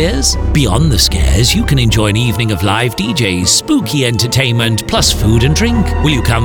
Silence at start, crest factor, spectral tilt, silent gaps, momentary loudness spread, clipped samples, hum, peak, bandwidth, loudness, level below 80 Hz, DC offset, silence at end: 0 s; 10 dB; -4 dB/octave; none; 3 LU; under 0.1%; none; 0 dBFS; 20 kHz; -12 LUFS; -20 dBFS; under 0.1%; 0 s